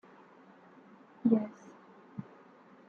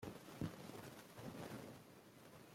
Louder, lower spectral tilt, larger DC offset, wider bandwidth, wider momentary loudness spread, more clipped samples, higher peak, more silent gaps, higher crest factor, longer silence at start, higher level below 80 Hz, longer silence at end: first, -32 LUFS vs -54 LUFS; first, -9.5 dB/octave vs -5.5 dB/octave; neither; second, 6.6 kHz vs 16.5 kHz; first, 27 LU vs 12 LU; neither; first, -14 dBFS vs -32 dBFS; neither; about the same, 24 dB vs 22 dB; first, 1.25 s vs 0 s; second, -82 dBFS vs -76 dBFS; first, 0.65 s vs 0 s